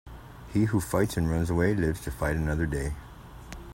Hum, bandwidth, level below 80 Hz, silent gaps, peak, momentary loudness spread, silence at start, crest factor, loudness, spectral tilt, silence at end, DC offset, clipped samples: none; 16.5 kHz; -40 dBFS; none; -10 dBFS; 20 LU; 0.05 s; 18 dB; -28 LUFS; -7 dB/octave; 0 s; under 0.1%; under 0.1%